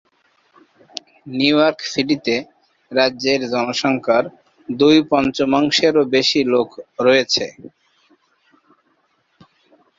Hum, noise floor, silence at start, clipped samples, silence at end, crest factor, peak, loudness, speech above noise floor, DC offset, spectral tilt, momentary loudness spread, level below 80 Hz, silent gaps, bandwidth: none; -63 dBFS; 1.25 s; under 0.1%; 2.5 s; 18 dB; -2 dBFS; -17 LUFS; 47 dB; under 0.1%; -4 dB/octave; 15 LU; -58 dBFS; none; 7.8 kHz